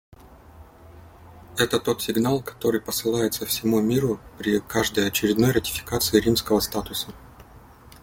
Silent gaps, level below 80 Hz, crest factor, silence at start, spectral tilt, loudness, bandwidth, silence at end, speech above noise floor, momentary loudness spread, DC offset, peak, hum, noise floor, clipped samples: none; -48 dBFS; 22 dB; 0.55 s; -4.5 dB/octave; -23 LUFS; 17 kHz; 0.05 s; 25 dB; 7 LU; under 0.1%; -4 dBFS; none; -48 dBFS; under 0.1%